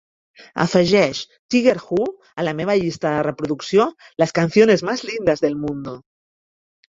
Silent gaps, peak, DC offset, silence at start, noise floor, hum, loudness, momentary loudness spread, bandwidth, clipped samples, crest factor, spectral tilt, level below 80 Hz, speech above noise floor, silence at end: 1.39-1.49 s; -2 dBFS; under 0.1%; 0.4 s; under -90 dBFS; none; -19 LUFS; 12 LU; 7.8 kHz; under 0.1%; 18 dB; -5.5 dB/octave; -56 dBFS; over 71 dB; 0.95 s